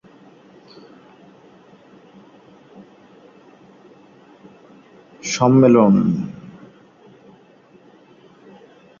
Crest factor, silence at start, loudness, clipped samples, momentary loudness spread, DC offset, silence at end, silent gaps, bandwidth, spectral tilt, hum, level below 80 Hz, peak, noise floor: 20 dB; 5.25 s; -15 LUFS; under 0.1%; 24 LU; under 0.1%; 2.5 s; none; 7.4 kHz; -6.5 dB/octave; none; -60 dBFS; -2 dBFS; -50 dBFS